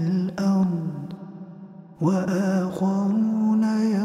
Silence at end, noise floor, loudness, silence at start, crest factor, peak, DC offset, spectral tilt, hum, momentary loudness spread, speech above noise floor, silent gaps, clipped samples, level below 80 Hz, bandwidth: 0 s; -43 dBFS; -23 LUFS; 0 s; 14 dB; -10 dBFS; under 0.1%; -8 dB/octave; none; 19 LU; 21 dB; none; under 0.1%; -66 dBFS; 10.5 kHz